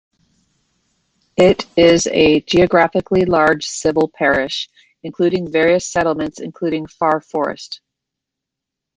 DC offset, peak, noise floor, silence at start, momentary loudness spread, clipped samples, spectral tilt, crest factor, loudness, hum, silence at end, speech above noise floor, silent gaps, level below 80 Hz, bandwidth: under 0.1%; 0 dBFS; -82 dBFS; 1.4 s; 13 LU; under 0.1%; -4.5 dB/octave; 16 dB; -16 LUFS; none; 1.2 s; 67 dB; none; -46 dBFS; 9.6 kHz